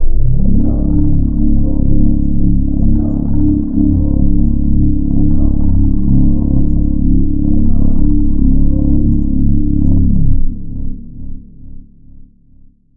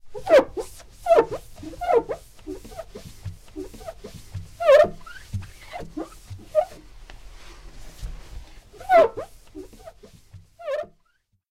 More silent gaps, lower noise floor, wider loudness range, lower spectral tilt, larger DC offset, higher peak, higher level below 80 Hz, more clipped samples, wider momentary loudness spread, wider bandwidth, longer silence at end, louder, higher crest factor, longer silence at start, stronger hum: neither; second, -42 dBFS vs -68 dBFS; second, 3 LU vs 9 LU; first, -15.5 dB/octave vs -5 dB/octave; neither; first, 0 dBFS vs -6 dBFS; first, -14 dBFS vs -46 dBFS; neither; second, 4 LU vs 24 LU; second, 1.1 kHz vs 15.5 kHz; first, 1.15 s vs 0.65 s; first, -14 LUFS vs -21 LUFS; second, 8 dB vs 20 dB; about the same, 0 s vs 0.05 s; neither